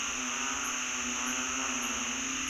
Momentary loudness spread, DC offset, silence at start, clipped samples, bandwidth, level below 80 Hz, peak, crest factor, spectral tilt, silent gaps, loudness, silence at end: 1 LU; under 0.1%; 0 s; under 0.1%; 16 kHz; -58 dBFS; -20 dBFS; 14 dB; 0 dB/octave; none; -31 LUFS; 0 s